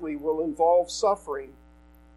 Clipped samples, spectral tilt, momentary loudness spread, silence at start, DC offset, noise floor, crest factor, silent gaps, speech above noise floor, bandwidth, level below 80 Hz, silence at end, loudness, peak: under 0.1%; -4 dB/octave; 14 LU; 0 s; under 0.1%; -53 dBFS; 16 dB; none; 29 dB; 12.5 kHz; -54 dBFS; 0.65 s; -25 LUFS; -12 dBFS